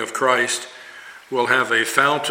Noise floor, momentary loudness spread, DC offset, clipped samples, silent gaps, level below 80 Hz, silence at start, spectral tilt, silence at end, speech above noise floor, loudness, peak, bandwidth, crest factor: -40 dBFS; 21 LU; under 0.1%; under 0.1%; none; -72 dBFS; 0 s; -2 dB/octave; 0 s; 21 dB; -19 LUFS; 0 dBFS; 17 kHz; 20 dB